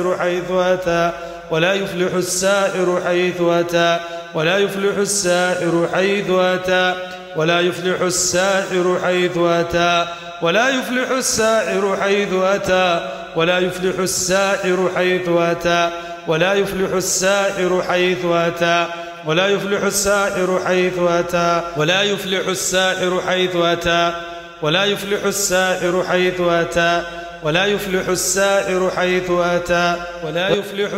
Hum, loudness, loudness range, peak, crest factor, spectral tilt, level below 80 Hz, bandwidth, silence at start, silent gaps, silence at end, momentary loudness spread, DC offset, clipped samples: none; -17 LUFS; 1 LU; -2 dBFS; 14 dB; -3.5 dB/octave; -48 dBFS; 16 kHz; 0 s; none; 0 s; 4 LU; under 0.1%; under 0.1%